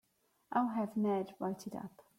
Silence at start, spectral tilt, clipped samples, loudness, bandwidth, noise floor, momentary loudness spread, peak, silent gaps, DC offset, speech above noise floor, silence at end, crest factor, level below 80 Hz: 0.5 s; -7.5 dB/octave; under 0.1%; -37 LUFS; 15.5 kHz; -69 dBFS; 11 LU; -20 dBFS; none; under 0.1%; 33 dB; 0.15 s; 18 dB; -80 dBFS